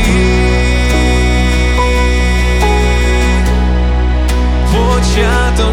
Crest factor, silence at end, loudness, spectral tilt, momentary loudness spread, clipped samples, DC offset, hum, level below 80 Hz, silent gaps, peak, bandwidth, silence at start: 10 dB; 0 s; -12 LUFS; -5.5 dB/octave; 2 LU; under 0.1%; under 0.1%; none; -12 dBFS; none; 0 dBFS; 12.5 kHz; 0 s